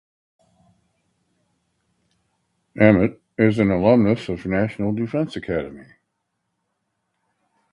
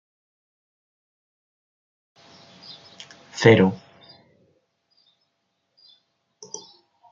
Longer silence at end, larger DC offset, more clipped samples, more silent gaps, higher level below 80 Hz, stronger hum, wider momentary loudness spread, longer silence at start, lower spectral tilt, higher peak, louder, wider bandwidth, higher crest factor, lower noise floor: first, 1.9 s vs 0.55 s; neither; neither; neither; first, -48 dBFS vs -68 dBFS; neither; second, 11 LU vs 28 LU; second, 2.75 s vs 3.35 s; first, -8.5 dB/octave vs -6 dB/octave; about the same, 0 dBFS vs -2 dBFS; about the same, -20 LUFS vs -18 LUFS; first, 10 kHz vs 7.6 kHz; about the same, 22 dB vs 26 dB; about the same, -76 dBFS vs -75 dBFS